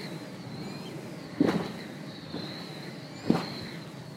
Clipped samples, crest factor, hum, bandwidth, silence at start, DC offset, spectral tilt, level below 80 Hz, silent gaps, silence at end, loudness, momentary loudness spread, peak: under 0.1%; 26 dB; none; 16 kHz; 0 s; under 0.1%; -6 dB/octave; -66 dBFS; none; 0 s; -34 LUFS; 13 LU; -8 dBFS